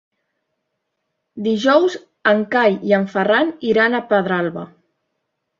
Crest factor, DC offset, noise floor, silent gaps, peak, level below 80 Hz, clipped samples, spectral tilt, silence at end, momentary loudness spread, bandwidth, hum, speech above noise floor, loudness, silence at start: 18 dB; under 0.1%; -75 dBFS; none; -2 dBFS; -64 dBFS; under 0.1%; -6 dB/octave; 0.95 s; 9 LU; 7.6 kHz; none; 58 dB; -17 LUFS; 1.35 s